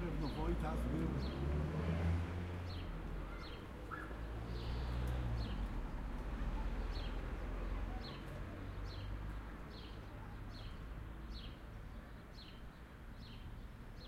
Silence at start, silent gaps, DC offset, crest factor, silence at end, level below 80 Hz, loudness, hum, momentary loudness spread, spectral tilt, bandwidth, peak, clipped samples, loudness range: 0 s; none; under 0.1%; 16 dB; 0 s; -46 dBFS; -45 LUFS; none; 13 LU; -7 dB/octave; 15 kHz; -28 dBFS; under 0.1%; 10 LU